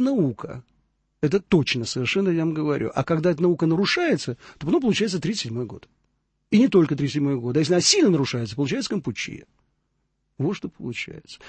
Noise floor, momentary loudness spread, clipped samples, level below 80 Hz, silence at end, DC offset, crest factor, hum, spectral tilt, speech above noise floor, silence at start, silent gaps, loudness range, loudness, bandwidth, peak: -73 dBFS; 14 LU; under 0.1%; -56 dBFS; 0 s; under 0.1%; 18 dB; none; -5 dB/octave; 50 dB; 0 s; none; 3 LU; -23 LUFS; 8.8 kHz; -4 dBFS